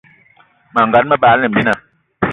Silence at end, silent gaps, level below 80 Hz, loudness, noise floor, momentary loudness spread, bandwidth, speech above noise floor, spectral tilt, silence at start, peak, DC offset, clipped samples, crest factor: 0 s; none; -48 dBFS; -13 LUFS; -51 dBFS; 10 LU; 10.5 kHz; 39 dB; -7 dB/octave; 0.75 s; 0 dBFS; under 0.1%; under 0.1%; 14 dB